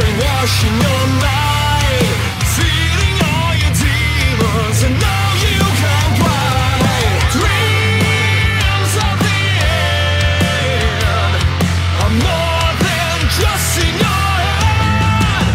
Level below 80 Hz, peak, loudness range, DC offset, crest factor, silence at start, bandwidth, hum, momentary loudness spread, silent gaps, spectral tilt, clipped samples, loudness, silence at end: -22 dBFS; -2 dBFS; 1 LU; under 0.1%; 10 dB; 0 s; 16.5 kHz; none; 2 LU; none; -4.5 dB/octave; under 0.1%; -14 LUFS; 0 s